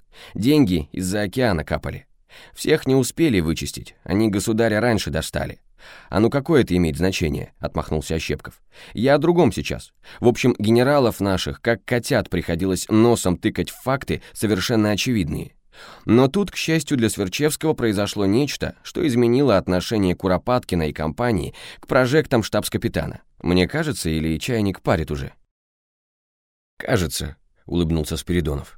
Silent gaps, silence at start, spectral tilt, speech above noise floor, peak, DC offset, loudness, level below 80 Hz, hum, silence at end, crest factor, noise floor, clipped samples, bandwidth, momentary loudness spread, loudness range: 25.51-26.77 s; 0.15 s; -5.5 dB/octave; over 70 dB; -4 dBFS; under 0.1%; -21 LUFS; -40 dBFS; none; 0.1 s; 18 dB; under -90 dBFS; under 0.1%; 17 kHz; 11 LU; 4 LU